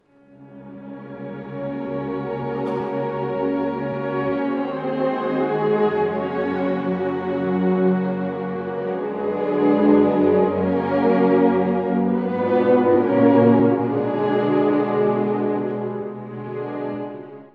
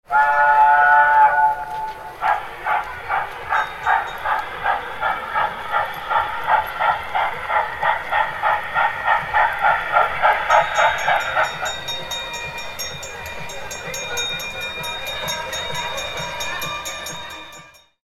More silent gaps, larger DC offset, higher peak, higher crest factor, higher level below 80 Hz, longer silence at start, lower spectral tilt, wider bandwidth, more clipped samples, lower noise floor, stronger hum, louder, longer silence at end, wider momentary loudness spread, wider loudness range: neither; neither; about the same, -2 dBFS vs -2 dBFS; about the same, 18 dB vs 18 dB; second, -62 dBFS vs -48 dBFS; first, 0.4 s vs 0.1 s; first, -10 dB/octave vs -1.5 dB/octave; second, 5 kHz vs 16.5 kHz; neither; first, -48 dBFS vs -44 dBFS; neither; about the same, -21 LUFS vs -20 LUFS; second, 0.1 s vs 0.35 s; about the same, 14 LU vs 14 LU; about the same, 7 LU vs 8 LU